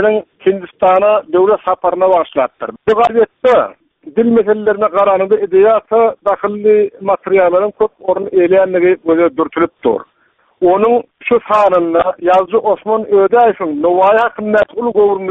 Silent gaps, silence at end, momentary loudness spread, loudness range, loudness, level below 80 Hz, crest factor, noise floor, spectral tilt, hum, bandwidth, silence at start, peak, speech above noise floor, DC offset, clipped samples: none; 0 s; 6 LU; 2 LU; -12 LUFS; -52 dBFS; 12 dB; -43 dBFS; -7.5 dB/octave; none; 5.6 kHz; 0 s; 0 dBFS; 32 dB; under 0.1%; under 0.1%